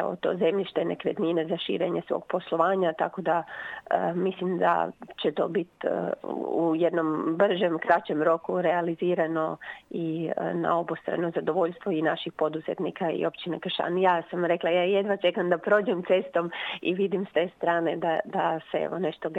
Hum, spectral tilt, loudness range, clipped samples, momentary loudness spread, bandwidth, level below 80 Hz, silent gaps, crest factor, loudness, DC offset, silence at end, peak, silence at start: none; -8 dB/octave; 3 LU; under 0.1%; 6 LU; 7.8 kHz; -74 dBFS; none; 18 dB; -27 LUFS; under 0.1%; 0 s; -8 dBFS; 0 s